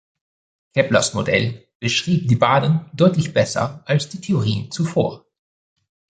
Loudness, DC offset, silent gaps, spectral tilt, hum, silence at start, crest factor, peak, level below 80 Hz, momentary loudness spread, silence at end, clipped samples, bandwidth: -19 LUFS; under 0.1%; 1.75-1.80 s; -5.5 dB/octave; none; 0.75 s; 18 dB; -2 dBFS; -52 dBFS; 8 LU; 1 s; under 0.1%; 9.4 kHz